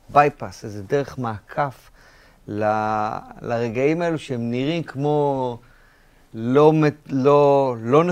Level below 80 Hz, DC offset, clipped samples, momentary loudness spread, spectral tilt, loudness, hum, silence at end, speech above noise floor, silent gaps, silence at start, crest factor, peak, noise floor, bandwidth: -54 dBFS; under 0.1%; under 0.1%; 15 LU; -7.5 dB/octave; -21 LUFS; none; 0 s; 33 dB; none; 0.1 s; 20 dB; -2 dBFS; -53 dBFS; 9.8 kHz